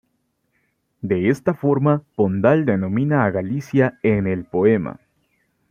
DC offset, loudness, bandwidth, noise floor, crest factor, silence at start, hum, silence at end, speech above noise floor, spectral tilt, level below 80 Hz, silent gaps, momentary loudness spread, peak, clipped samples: under 0.1%; -19 LUFS; 10 kHz; -70 dBFS; 18 dB; 1.05 s; none; 0.75 s; 51 dB; -9 dB/octave; -56 dBFS; none; 6 LU; -2 dBFS; under 0.1%